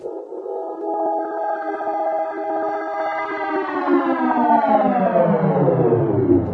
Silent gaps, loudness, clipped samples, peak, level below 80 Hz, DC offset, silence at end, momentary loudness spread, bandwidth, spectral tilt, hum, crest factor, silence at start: none; -20 LUFS; under 0.1%; -4 dBFS; -52 dBFS; under 0.1%; 0 s; 9 LU; 6 kHz; -10 dB/octave; none; 16 dB; 0 s